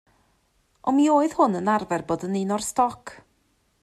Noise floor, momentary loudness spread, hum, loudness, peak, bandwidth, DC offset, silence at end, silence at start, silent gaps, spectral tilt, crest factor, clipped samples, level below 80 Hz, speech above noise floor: -67 dBFS; 10 LU; none; -23 LUFS; -6 dBFS; 14.5 kHz; under 0.1%; 0.65 s; 0.85 s; none; -5.5 dB/octave; 18 dB; under 0.1%; -62 dBFS; 45 dB